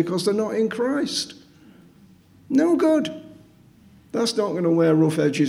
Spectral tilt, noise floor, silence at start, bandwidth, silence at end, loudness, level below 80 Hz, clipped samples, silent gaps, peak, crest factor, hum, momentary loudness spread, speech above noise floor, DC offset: -5.5 dB/octave; -52 dBFS; 0 s; 13.5 kHz; 0 s; -21 LUFS; -66 dBFS; under 0.1%; none; -8 dBFS; 14 dB; none; 11 LU; 31 dB; under 0.1%